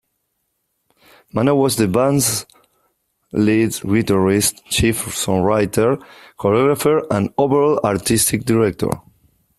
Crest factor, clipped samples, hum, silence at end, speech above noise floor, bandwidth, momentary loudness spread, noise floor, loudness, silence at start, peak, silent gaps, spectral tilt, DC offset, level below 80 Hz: 16 dB; under 0.1%; none; 0.6 s; 55 dB; 15 kHz; 7 LU; -71 dBFS; -17 LUFS; 1.35 s; -2 dBFS; none; -4.5 dB/octave; under 0.1%; -44 dBFS